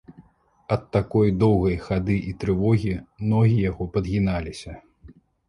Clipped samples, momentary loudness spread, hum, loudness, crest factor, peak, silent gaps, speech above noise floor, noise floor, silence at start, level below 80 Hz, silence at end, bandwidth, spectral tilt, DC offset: under 0.1%; 10 LU; none; -23 LUFS; 18 dB; -6 dBFS; none; 33 dB; -55 dBFS; 0.1 s; -40 dBFS; 0.4 s; 11 kHz; -8.5 dB/octave; under 0.1%